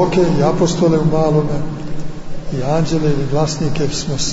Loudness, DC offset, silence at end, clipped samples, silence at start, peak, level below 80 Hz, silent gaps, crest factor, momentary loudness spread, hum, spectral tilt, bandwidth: -17 LUFS; under 0.1%; 0 s; under 0.1%; 0 s; -2 dBFS; -30 dBFS; none; 12 dB; 13 LU; none; -6 dB/octave; 8 kHz